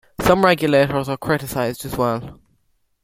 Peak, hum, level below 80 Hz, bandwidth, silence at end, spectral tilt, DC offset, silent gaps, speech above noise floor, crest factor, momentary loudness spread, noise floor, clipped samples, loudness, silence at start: -2 dBFS; none; -44 dBFS; 16.5 kHz; 0.7 s; -5.5 dB/octave; under 0.1%; none; 46 dB; 18 dB; 9 LU; -64 dBFS; under 0.1%; -19 LUFS; 0.2 s